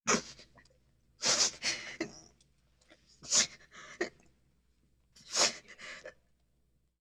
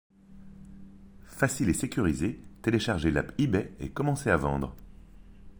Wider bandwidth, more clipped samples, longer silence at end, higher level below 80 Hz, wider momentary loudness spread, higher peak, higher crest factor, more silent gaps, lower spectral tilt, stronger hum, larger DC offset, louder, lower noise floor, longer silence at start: about the same, over 20 kHz vs over 20 kHz; neither; first, 0.9 s vs 0.05 s; second, -70 dBFS vs -46 dBFS; first, 23 LU vs 13 LU; about the same, -12 dBFS vs -10 dBFS; first, 26 dB vs 20 dB; neither; second, 0 dB/octave vs -5.5 dB/octave; neither; neither; about the same, -31 LUFS vs -29 LUFS; first, -75 dBFS vs -50 dBFS; second, 0.05 s vs 0.3 s